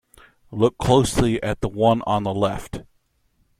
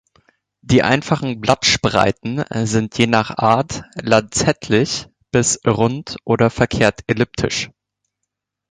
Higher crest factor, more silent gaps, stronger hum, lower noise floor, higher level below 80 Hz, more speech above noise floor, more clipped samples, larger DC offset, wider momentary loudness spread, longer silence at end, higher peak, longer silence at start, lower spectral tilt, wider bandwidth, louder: about the same, 18 dB vs 18 dB; neither; neither; second, -65 dBFS vs -79 dBFS; about the same, -40 dBFS vs -42 dBFS; second, 45 dB vs 62 dB; neither; neither; first, 17 LU vs 8 LU; second, 0.8 s vs 1.05 s; second, -4 dBFS vs 0 dBFS; second, 0.5 s vs 0.65 s; first, -6 dB/octave vs -4.5 dB/octave; first, 15 kHz vs 10.5 kHz; second, -21 LUFS vs -17 LUFS